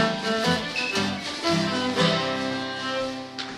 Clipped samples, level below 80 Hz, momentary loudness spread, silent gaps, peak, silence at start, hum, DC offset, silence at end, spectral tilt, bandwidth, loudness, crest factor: under 0.1%; -58 dBFS; 6 LU; none; -8 dBFS; 0 s; none; under 0.1%; 0 s; -4 dB/octave; 14 kHz; -25 LUFS; 18 dB